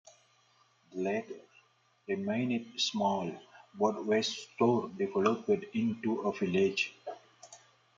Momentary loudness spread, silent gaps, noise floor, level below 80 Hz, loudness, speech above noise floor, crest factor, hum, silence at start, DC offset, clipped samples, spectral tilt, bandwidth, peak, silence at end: 17 LU; none; -68 dBFS; -78 dBFS; -32 LUFS; 36 dB; 18 dB; none; 0.9 s; under 0.1%; under 0.1%; -5 dB/octave; 7.6 kHz; -14 dBFS; 0.4 s